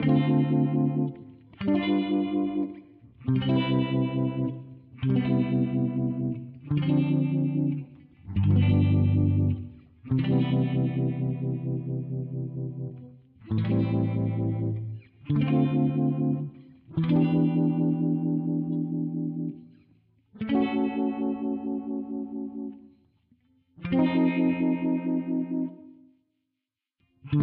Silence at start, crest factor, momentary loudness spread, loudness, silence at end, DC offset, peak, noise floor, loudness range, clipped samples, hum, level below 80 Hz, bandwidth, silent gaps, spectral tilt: 0 s; 14 dB; 12 LU; -27 LUFS; 0 s; under 0.1%; -12 dBFS; -86 dBFS; 5 LU; under 0.1%; none; -56 dBFS; 4.6 kHz; none; -8.5 dB/octave